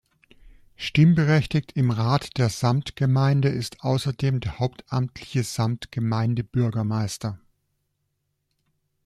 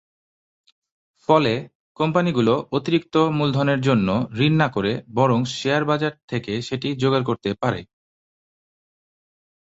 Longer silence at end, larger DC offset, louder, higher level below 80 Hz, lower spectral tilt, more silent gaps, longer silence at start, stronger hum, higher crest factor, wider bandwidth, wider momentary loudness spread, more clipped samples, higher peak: about the same, 1.7 s vs 1.8 s; neither; second, -24 LUFS vs -21 LUFS; about the same, -52 dBFS vs -54 dBFS; about the same, -6.5 dB/octave vs -6.5 dB/octave; second, none vs 1.75-1.95 s, 6.23-6.28 s; second, 0.8 s vs 1.3 s; neither; about the same, 16 dB vs 20 dB; first, 13 kHz vs 8 kHz; about the same, 9 LU vs 8 LU; neither; second, -8 dBFS vs -2 dBFS